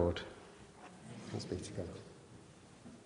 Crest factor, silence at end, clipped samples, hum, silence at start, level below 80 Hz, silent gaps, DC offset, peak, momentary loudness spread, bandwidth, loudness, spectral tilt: 24 dB; 0 s; under 0.1%; none; 0 s; -60 dBFS; none; under 0.1%; -20 dBFS; 15 LU; 10.5 kHz; -45 LUFS; -5.5 dB/octave